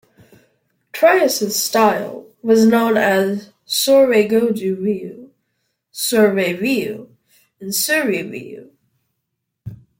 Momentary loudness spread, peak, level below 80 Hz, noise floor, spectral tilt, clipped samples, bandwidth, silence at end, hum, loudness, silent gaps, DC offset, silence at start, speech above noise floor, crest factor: 21 LU; -2 dBFS; -62 dBFS; -76 dBFS; -3.5 dB/octave; under 0.1%; 16.5 kHz; 0.25 s; none; -16 LUFS; none; under 0.1%; 0.95 s; 60 dB; 16 dB